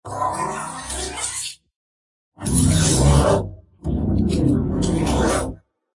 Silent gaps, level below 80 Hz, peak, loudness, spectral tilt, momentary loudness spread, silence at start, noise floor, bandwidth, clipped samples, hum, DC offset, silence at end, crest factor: 1.76-2.32 s; -30 dBFS; -4 dBFS; -20 LUFS; -5 dB/octave; 13 LU; 0.05 s; under -90 dBFS; 11.5 kHz; under 0.1%; none; under 0.1%; 0.4 s; 16 dB